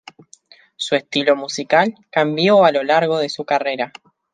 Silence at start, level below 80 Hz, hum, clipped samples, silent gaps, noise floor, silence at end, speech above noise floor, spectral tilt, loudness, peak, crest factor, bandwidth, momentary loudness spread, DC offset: 0.8 s; -68 dBFS; none; under 0.1%; none; -49 dBFS; 0.45 s; 32 dB; -4.5 dB/octave; -17 LUFS; -2 dBFS; 18 dB; 9.6 kHz; 9 LU; under 0.1%